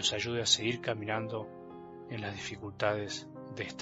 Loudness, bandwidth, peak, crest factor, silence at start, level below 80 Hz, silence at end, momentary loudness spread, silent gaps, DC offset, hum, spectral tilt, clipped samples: -33 LUFS; 8.2 kHz; -12 dBFS; 22 dB; 0 s; -66 dBFS; 0 s; 18 LU; none; under 0.1%; none; -3 dB/octave; under 0.1%